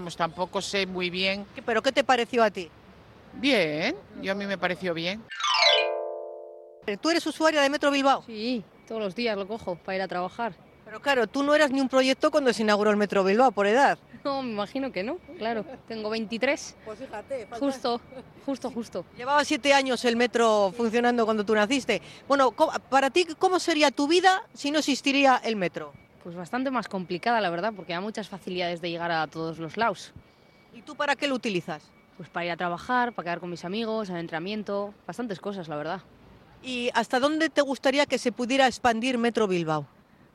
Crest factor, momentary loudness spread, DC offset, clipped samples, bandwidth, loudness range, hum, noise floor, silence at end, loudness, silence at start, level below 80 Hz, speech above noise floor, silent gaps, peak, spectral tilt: 20 dB; 13 LU; under 0.1%; under 0.1%; 13 kHz; 8 LU; none; -51 dBFS; 0.5 s; -26 LUFS; 0 s; -64 dBFS; 25 dB; none; -6 dBFS; -4 dB/octave